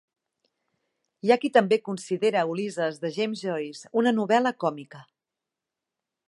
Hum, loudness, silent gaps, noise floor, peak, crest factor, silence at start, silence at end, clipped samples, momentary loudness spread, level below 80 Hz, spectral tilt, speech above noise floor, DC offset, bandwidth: none; -25 LUFS; none; -87 dBFS; -6 dBFS; 20 dB; 1.25 s; 1.25 s; under 0.1%; 9 LU; -82 dBFS; -5.5 dB/octave; 63 dB; under 0.1%; 11.5 kHz